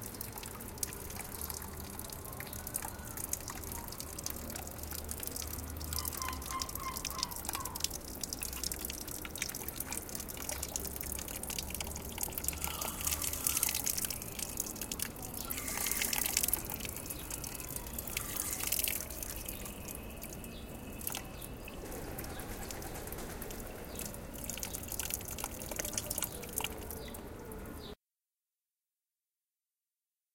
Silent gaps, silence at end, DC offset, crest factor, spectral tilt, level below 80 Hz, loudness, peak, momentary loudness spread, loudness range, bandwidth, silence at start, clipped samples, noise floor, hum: none; 2.4 s; under 0.1%; 32 dB; -2 dB/octave; -50 dBFS; -38 LUFS; -8 dBFS; 12 LU; 8 LU; 17 kHz; 0 s; under 0.1%; under -90 dBFS; none